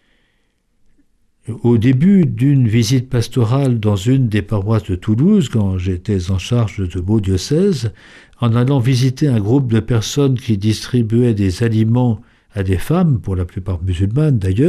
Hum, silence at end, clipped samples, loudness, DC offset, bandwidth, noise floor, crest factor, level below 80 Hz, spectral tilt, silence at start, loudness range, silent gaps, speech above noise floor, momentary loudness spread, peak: none; 0 s; under 0.1%; -16 LUFS; under 0.1%; 13.5 kHz; -61 dBFS; 12 dB; -38 dBFS; -7 dB/octave; 1.45 s; 2 LU; none; 47 dB; 8 LU; -4 dBFS